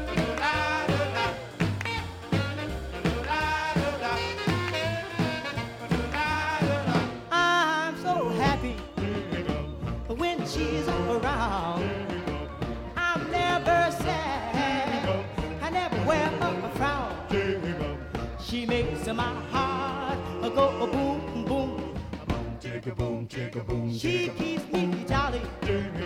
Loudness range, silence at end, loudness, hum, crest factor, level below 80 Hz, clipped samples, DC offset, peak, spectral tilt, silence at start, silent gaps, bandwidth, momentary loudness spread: 3 LU; 0 s; -28 LUFS; none; 16 dB; -42 dBFS; under 0.1%; under 0.1%; -12 dBFS; -5.5 dB/octave; 0 s; none; 16 kHz; 8 LU